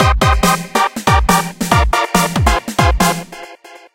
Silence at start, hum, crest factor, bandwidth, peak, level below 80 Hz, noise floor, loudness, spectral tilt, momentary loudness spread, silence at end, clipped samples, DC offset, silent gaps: 0 s; none; 14 dB; 17 kHz; 0 dBFS; -20 dBFS; -38 dBFS; -14 LUFS; -4.5 dB/octave; 9 LU; 0.15 s; under 0.1%; 0.2%; none